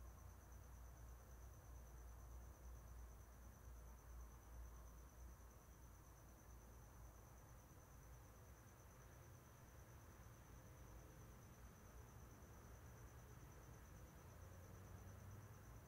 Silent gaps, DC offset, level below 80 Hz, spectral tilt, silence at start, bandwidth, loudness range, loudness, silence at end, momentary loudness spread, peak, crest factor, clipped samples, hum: none; under 0.1%; -64 dBFS; -5 dB/octave; 0 s; 16 kHz; 2 LU; -63 LUFS; 0 s; 4 LU; -48 dBFS; 12 dB; under 0.1%; none